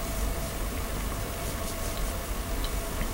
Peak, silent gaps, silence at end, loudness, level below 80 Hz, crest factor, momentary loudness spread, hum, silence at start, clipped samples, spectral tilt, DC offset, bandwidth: -18 dBFS; none; 0 s; -33 LUFS; -34 dBFS; 12 dB; 1 LU; none; 0 s; under 0.1%; -4 dB/octave; under 0.1%; 16 kHz